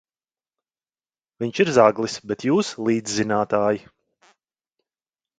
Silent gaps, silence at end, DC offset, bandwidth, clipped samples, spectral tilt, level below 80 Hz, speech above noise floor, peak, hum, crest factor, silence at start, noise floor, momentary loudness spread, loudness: none; 1.6 s; under 0.1%; 9.4 kHz; under 0.1%; -5 dB/octave; -64 dBFS; over 69 dB; 0 dBFS; none; 24 dB; 1.4 s; under -90 dBFS; 12 LU; -21 LUFS